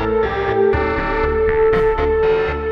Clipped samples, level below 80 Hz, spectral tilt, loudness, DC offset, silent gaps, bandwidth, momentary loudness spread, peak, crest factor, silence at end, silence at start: under 0.1%; -28 dBFS; -8 dB/octave; -17 LUFS; under 0.1%; none; 5.8 kHz; 4 LU; -4 dBFS; 12 dB; 0 s; 0 s